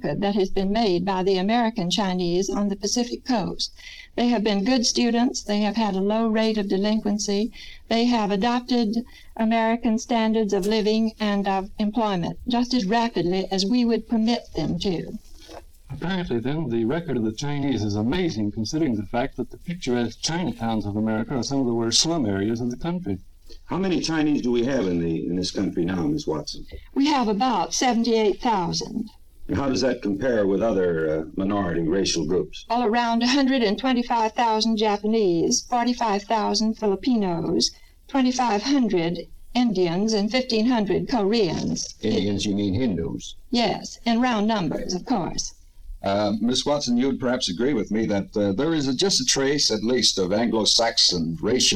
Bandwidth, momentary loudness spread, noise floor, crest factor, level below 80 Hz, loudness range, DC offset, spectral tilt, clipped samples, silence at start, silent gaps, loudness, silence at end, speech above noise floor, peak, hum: 13 kHz; 7 LU; -43 dBFS; 16 dB; -44 dBFS; 4 LU; under 0.1%; -4.5 dB/octave; under 0.1%; 0 s; none; -23 LUFS; 0 s; 21 dB; -6 dBFS; none